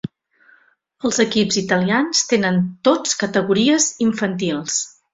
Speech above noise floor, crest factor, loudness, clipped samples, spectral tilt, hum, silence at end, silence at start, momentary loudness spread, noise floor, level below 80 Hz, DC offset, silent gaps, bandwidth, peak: 38 dB; 18 dB; -18 LUFS; under 0.1%; -3.5 dB/octave; none; 0.25 s; 0.05 s; 6 LU; -56 dBFS; -58 dBFS; under 0.1%; none; 8 kHz; -2 dBFS